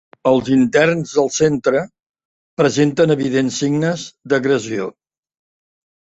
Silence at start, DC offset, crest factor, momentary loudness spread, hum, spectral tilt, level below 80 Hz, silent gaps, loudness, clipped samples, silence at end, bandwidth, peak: 0.25 s; under 0.1%; 16 dB; 10 LU; none; -5.5 dB/octave; -54 dBFS; 2.09-2.14 s, 2.25-2.57 s; -17 LUFS; under 0.1%; 1.2 s; 8.2 kHz; -2 dBFS